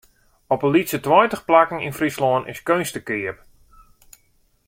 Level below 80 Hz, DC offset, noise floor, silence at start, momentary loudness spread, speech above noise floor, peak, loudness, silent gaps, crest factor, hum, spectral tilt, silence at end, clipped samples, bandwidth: -56 dBFS; under 0.1%; -61 dBFS; 0.5 s; 10 LU; 42 dB; 0 dBFS; -20 LUFS; none; 20 dB; none; -5 dB/octave; 1.35 s; under 0.1%; 16.5 kHz